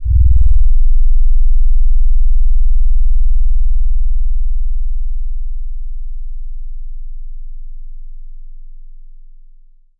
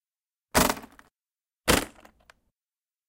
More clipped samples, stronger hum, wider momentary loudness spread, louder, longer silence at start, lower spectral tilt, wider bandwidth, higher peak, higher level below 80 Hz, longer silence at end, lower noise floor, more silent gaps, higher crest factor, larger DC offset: neither; first, 60 Hz at -30 dBFS vs none; first, 21 LU vs 12 LU; first, -19 LUFS vs -25 LUFS; second, 0 s vs 0.55 s; first, -15 dB/octave vs -3 dB/octave; second, 0.2 kHz vs 17 kHz; first, -2 dBFS vs -8 dBFS; first, -12 dBFS vs -46 dBFS; second, 0 s vs 1.2 s; second, -41 dBFS vs under -90 dBFS; neither; second, 8 dB vs 22 dB; first, 10% vs under 0.1%